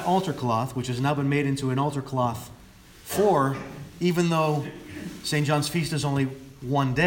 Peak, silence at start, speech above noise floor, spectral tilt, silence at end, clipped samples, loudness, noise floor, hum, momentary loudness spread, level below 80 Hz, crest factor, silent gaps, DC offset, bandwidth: -8 dBFS; 0 s; 25 dB; -6 dB/octave; 0 s; under 0.1%; -26 LUFS; -49 dBFS; none; 15 LU; -54 dBFS; 16 dB; none; under 0.1%; 18 kHz